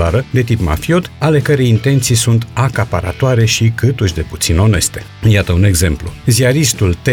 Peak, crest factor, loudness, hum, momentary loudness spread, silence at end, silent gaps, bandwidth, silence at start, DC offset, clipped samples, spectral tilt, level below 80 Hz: -2 dBFS; 10 dB; -13 LUFS; none; 6 LU; 0 s; none; 18.5 kHz; 0 s; under 0.1%; under 0.1%; -5 dB/octave; -28 dBFS